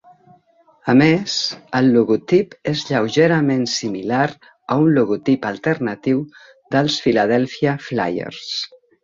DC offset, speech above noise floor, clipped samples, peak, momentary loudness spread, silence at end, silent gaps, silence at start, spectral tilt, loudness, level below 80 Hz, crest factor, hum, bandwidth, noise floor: under 0.1%; 37 dB; under 0.1%; -2 dBFS; 10 LU; 0.35 s; none; 0.85 s; -5.5 dB/octave; -18 LUFS; -58 dBFS; 16 dB; none; 7.6 kHz; -55 dBFS